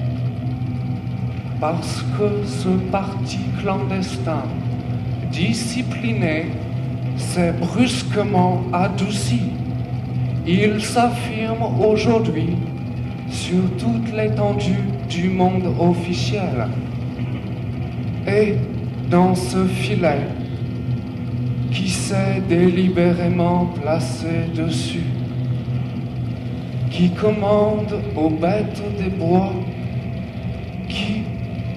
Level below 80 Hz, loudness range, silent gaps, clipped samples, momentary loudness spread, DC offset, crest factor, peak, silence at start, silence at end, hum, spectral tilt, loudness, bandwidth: -40 dBFS; 3 LU; none; under 0.1%; 9 LU; under 0.1%; 16 dB; -4 dBFS; 0 s; 0 s; none; -6.5 dB/octave; -21 LUFS; 12.5 kHz